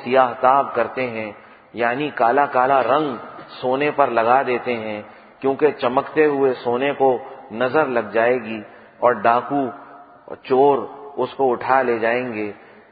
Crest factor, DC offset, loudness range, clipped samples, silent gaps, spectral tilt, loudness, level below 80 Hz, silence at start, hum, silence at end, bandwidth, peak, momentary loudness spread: 20 dB; under 0.1%; 2 LU; under 0.1%; none; -10.5 dB/octave; -19 LUFS; -64 dBFS; 0 s; none; 0.35 s; 5 kHz; 0 dBFS; 15 LU